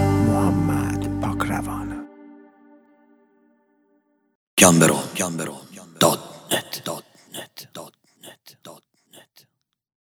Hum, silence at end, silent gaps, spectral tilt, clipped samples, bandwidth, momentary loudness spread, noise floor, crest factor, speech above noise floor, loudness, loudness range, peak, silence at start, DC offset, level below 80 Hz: none; 1.45 s; 4.35-4.57 s; -4 dB/octave; under 0.1%; 19.5 kHz; 25 LU; -69 dBFS; 24 dB; 50 dB; -21 LUFS; 13 LU; 0 dBFS; 0 s; under 0.1%; -46 dBFS